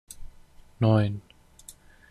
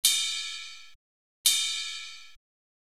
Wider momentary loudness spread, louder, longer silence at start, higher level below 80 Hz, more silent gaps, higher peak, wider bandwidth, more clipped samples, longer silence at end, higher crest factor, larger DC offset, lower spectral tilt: first, 26 LU vs 21 LU; about the same, -25 LUFS vs -27 LUFS; first, 0.2 s vs 0.05 s; first, -50 dBFS vs -72 dBFS; second, none vs 0.95-1.44 s; second, -10 dBFS vs -6 dBFS; second, 12 kHz vs 16.5 kHz; neither; second, 0.4 s vs 0.55 s; about the same, 20 dB vs 24 dB; second, under 0.1% vs 0.3%; first, -7.5 dB/octave vs 5 dB/octave